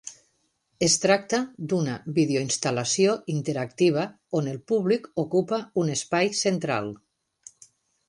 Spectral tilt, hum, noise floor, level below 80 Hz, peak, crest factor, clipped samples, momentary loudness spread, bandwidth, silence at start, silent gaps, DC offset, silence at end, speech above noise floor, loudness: -4 dB/octave; none; -71 dBFS; -66 dBFS; -6 dBFS; 20 dB; under 0.1%; 7 LU; 11.5 kHz; 0.05 s; none; under 0.1%; 1.15 s; 47 dB; -25 LUFS